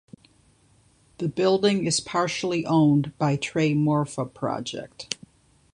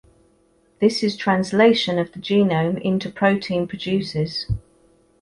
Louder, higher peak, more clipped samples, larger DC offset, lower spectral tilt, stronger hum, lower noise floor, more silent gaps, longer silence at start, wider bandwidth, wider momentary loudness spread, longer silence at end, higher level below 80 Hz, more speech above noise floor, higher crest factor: second, -24 LUFS vs -21 LUFS; about the same, -6 dBFS vs -4 dBFS; neither; neither; about the same, -5.5 dB/octave vs -6 dB/octave; neither; about the same, -60 dBFS vs -60 dBFS; neither; first, 1.2 s vs 0.8 s; about the same, 11 kHz vs 11.5 kHz; first, 13 LU vs 9 LU; about the same, 0.6 s vs 0.65 s; second, -62 dBFS vs -46 dBFS; about the same, 37 dB vs 40 dB; about the same, 20 dB vs 18 dB